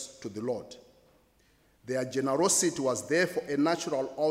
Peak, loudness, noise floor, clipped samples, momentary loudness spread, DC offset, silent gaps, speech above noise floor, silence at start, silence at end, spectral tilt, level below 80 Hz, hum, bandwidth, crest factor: -14 dBFS; -29 LUFS; -65 dBFS; under 0.1%; 12 LU; under 0.1%; none; 36 dB; 0 s; 0 s; -3.5 dB/octave; -70 dBFS; none; 16 kHz; 18 dB